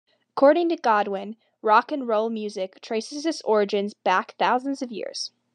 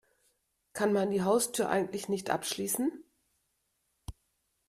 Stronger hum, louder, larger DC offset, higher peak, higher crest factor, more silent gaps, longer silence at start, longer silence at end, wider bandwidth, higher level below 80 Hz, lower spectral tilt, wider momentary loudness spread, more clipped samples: neither; first, -24 LUFS vs -31 LUFS; neither; first, -4 dBFS vs -14 dBFS; about the same, 20 dB vs 20 dB; neither; second, 0.35 s vs 0.75 s; second, 0.25 s vs 0.55 s; second, 10.5 kHz vs 15.5 kHz; second, under -90 dBFS vs -60 dBFS; about the same, -4.5 dB/octave vs -4 dB/octave; second, 12 LU vs 22 LU; neither